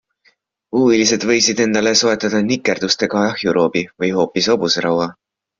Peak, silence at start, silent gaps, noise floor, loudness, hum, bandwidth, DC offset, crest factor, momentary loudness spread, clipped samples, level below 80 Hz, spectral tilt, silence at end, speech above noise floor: -2 dBFS; 0.75 s; none; -59 dBFS; -16 LUFS; none; 7.6 kHz; under 0.1%; 14 dB; 6 LU; under 0.1%; -56 dBFS; -3.5 dB/octave; 0.5 s; 43 dB